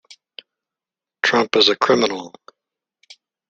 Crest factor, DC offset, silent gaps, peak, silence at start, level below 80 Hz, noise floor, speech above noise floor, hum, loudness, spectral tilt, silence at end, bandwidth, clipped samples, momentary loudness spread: 22 dB; under 0.1%; none; 0 dBFS; 1.25 s; -62 dBFS; -89 dBFS; 72 dB; none; -17 LUFS; -3 dB/octave; 1.2 s; 8.6 kHz; under 0.1%; 14 LU